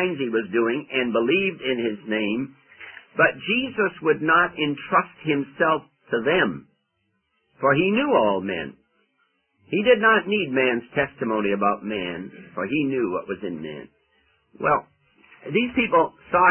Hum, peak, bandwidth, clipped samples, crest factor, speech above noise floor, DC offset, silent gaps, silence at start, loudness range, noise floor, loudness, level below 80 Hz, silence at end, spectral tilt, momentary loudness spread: none; -6 dBFS; 3.4 kHz; under 0.1%; 18 dB; 50 dB; under 0.1%; none; 0 s; 5 LU; -73 dBFS; -22 LUFS; -60 dBFS; 0 s; -10 dB/octave; 13 LU